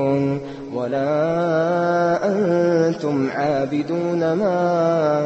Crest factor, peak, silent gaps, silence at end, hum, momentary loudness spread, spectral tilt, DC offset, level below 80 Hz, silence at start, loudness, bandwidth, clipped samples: 12 dB; -8 dBFS; none; 0 s; none; 5 LU; -7.5 dB/octave; under 0.1%; -58 dBFS; 0 s; -20 LUFS; 8.2 kHz; under 0.1%